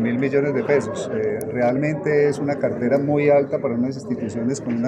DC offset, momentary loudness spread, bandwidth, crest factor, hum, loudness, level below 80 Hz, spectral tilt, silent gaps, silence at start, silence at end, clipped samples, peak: under 0.1%; 7 LU; 16 kHz; 16 dB; none; -21 LUFS; -60 dBFS; -7 dB/octave; none; 0 s; 0 s; under 0.1%; -4 dBFS